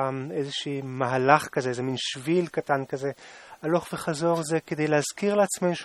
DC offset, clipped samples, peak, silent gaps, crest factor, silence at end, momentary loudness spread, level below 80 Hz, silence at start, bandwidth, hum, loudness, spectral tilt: under 0.1%; under 0.1%; -2 dBFS; none; 24 dB; 0 s; 10 LU; -68 dBFS; 0 s; 14.5 kHz; none; -26 LUFS; -5 dB/octave